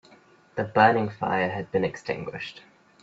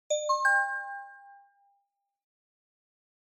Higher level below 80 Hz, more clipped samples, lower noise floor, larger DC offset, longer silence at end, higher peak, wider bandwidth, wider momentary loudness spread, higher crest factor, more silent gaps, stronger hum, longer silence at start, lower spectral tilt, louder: first, -62 dBFS vs under -90 dBFS; neither; second, -56 dBFS vs -78 dBFS; neither; second, 0.45 s vs 2 s; first, -4 dBFS vs -14 dBFS; second, 8 kHz vs 14.5 kHz; about the same, 17 LU vs 19 LU; about the same, 24 dB vs 20 dB; neither; neither; first, 0.55 s vs 0.1 s; first, -6.5 dB/octave vs 6 dB/octave; about the same, -25 LUFS vs -27 LUFS